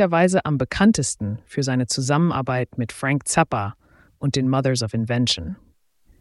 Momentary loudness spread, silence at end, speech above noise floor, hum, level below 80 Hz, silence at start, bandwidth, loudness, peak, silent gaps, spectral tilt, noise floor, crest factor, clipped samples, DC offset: 10 LU; 0.65 s; 37 dB; none; -48 dBFS; 0 s; 12 kHz; -21 LUFS; -4 dBFS; none; -5 dB/octave; -57 dBFS; 18 dB; under 0.1%; under 0.1%